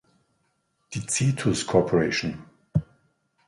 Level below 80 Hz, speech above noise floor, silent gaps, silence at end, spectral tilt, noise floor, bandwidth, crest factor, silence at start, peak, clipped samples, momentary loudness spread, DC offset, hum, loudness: -52 dBFS; 48 dB; none; 0.65 s; -5 dB/octave; -72 dBFS; 11.5 kHz; 22 dB; 0.9 s; -6 dBFS; under 0.1%; 13 LU; under 0.1%; none; -25 LUFS